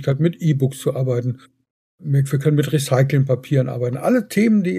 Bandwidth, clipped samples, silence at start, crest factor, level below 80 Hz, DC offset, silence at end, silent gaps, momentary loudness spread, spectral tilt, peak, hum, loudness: 15 kHz; under 0.1%; 0 s; 14 dB; -62 dBFS; under 0.1%; 0 s; 1.70-1.98 s; 6 LU; -7.5 dB/octave; -4 dBFS; none; -19 LUFS